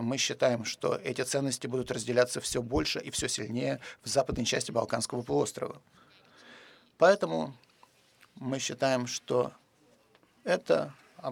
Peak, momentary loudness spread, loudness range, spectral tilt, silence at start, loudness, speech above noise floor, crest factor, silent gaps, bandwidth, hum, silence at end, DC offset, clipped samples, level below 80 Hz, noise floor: -10 dBFS; 10 LU; 3 LU; -3.5 dB/octave; 0 s; -30 LUFS; 35 dB; 22 dB; none; 17 kHz; none; 0 s; under 0.1%; under 0.1%; -56 dBFS; -65 dBFS